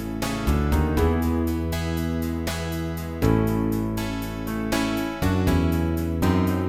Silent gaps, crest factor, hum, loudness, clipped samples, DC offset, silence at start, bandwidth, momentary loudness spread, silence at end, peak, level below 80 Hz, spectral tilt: none; 16 dB; none; -24 LUFS; under 0.1%; 0.3%; 0 s; 18 kHz; 7 LU; 0 s; -6 dBFS; -32 dBFS; -6.5 dB/octave